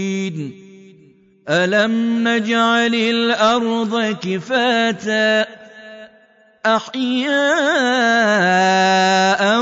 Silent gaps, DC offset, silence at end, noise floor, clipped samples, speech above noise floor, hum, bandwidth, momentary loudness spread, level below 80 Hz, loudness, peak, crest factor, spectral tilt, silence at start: none; under 0.1%; 0 s; -52 dBFS; under 0.1%; 36 dB; none; 7.8 kHz; 9 LU; -66 dBFS; -16 LUFS; -4 dBFS; 12 dB; -4 dB/octave; 0 s